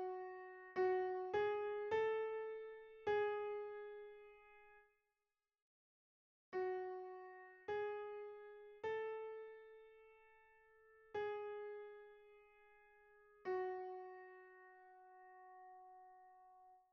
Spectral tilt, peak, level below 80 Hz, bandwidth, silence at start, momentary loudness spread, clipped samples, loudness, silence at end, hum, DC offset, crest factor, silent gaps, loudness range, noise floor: -3 dB/octave; -28 dBFS; -84 dBFS; 6.6 kHz; 0 s; 24 LU; under 0.1%; -45 LUFS; 0.15 s; none; under 0.1%; 18 dB; 5.62-6.52 s; 10 LU; under -90 dBFS